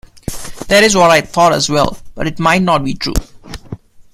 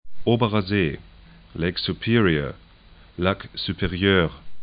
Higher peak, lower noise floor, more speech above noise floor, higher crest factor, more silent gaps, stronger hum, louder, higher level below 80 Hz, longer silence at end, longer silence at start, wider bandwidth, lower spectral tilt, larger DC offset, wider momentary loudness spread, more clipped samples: first, 0 dBFS vs -4 dBFS; second, -32 dBFS vs -50 dBFS; second, 20 dB vs 27 dB; second, 14 dB vs 20 dB; neither; neither; first, -12 LUFS vs -23 LUFS; first, -32 dBFS vs -44 dBFS; first, 0.15 s vs 0 s; first, 0.3 s vs 0.05 s; first, 16 kHz vs 5.2 kHz; second, -4 dB/octave vs -11 dB/octave; neither; first, 22 LU vs 11 LU; neither